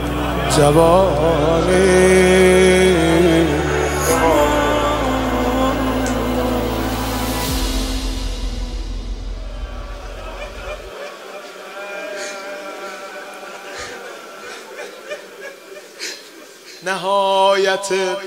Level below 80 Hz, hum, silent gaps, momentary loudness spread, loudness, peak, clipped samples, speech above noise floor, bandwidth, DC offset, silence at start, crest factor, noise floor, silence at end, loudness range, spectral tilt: -28 dBFS; none; none; 20 LU; -16 LUFS; 0 dBFS; under 0.1%; 27 dB; 16.5 kHz; under 0.1%; 0 s; 18 dB; -39 dBFS; 0 s; 18 LU; -5 dB/octave